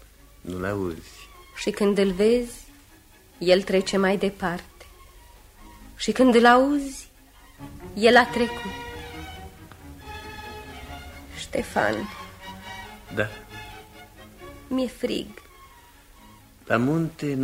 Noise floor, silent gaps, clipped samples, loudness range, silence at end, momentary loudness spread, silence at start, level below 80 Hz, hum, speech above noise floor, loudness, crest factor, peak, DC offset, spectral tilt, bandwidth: -52 dBFS; none; under 0.1%; 12 LU; 0 s; 25 LU; 0.45 s; -48 dBFS; none; 30 dB; -23 LUFS; 24 dB; -2 dBFS; under 0.1%; -5 dB/octave; 16 kHz